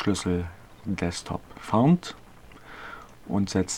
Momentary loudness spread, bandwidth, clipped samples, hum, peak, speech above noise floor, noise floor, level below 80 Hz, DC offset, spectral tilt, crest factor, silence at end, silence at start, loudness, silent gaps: 21 LU; 13 kHz; under 0.1%; none; -10 dBFS; 23 dB; -49 dBFS; -50 dBFS; 0.2%; -6 dB/octave; 18 dB; 0 s; 0 s; -27 LUFS; none